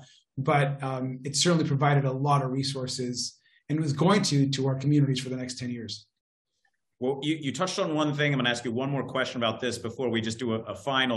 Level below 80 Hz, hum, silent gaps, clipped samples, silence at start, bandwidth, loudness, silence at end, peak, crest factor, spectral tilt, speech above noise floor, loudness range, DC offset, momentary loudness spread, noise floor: -68 dBFS; none; 6.21-6.45 s; under 0.1%; 0 s; 12 kHz; -27 LUFS; 0 s; -10 dBFS; 18 dB; -5 dB/octave; 49 dB; 4 LU; under 0.1%; 10 LU; -76 dBFS